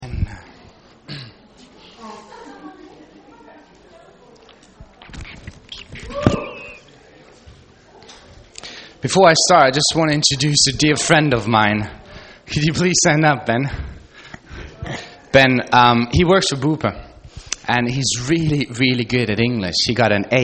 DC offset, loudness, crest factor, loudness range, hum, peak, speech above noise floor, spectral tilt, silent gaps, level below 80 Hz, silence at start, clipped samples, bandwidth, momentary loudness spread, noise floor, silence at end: under 0.1%; -16 LUFS; 20 dB; 13 LU; none; 0 dBFS; 31 dB; -4 dB/octave; none; -40 dBFS; 0 s; under 0.1%; 8.8 kHz; 24 LU; -47 dBFS; 0 s